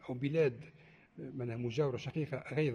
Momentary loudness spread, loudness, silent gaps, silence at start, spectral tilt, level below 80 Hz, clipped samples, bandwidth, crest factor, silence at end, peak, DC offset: 19 LU; -36 LUFS; none; 0.05 s; -7.5 dB/octave; -70 dBFS; under 0.1%; 9.8 kHz; 16 dB; 0 s; -20 dBFS; under 0.1%